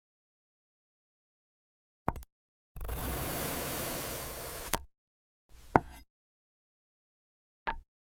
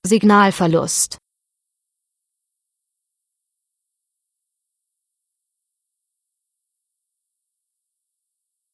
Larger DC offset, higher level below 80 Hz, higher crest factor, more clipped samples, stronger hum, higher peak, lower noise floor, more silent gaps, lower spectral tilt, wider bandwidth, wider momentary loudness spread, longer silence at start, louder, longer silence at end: neither; first, -48 dBFS vs -62 dBFS; first, 36 dB vs 22 dB; neither; neither; about the same, -4 dBFS vs -2 dBFS; first, under -90 dBFS vs -80 dBFS; first, 2.32-2.75 s, 4.98-5.49 s, 6.10-7.66 s vs none; about the same, -4 dB/octave vs -4.5 dB/octave; first, 17 kHz vs 11 kHz; first, 17 LU vs 6 LU; first, 2.05 s vs 0.05 s; second, -36 LUFS vs -15 LUFS; second, 0.25 s vs 7.6 s